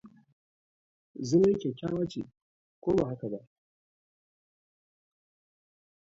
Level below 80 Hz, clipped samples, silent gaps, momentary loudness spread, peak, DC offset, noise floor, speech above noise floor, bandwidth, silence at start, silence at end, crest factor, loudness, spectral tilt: -62 dBFS; under 0.1%; 0.33-1.14 s, 2.37-2.82 s; 18 LU; -14 dBFS; under 0.1%; under -90 dBFS; over 61 dB; 7.8 kHz; 0.05 s; 2.65 s; 20 dB; -30 LUFS; -7.5 dB/octave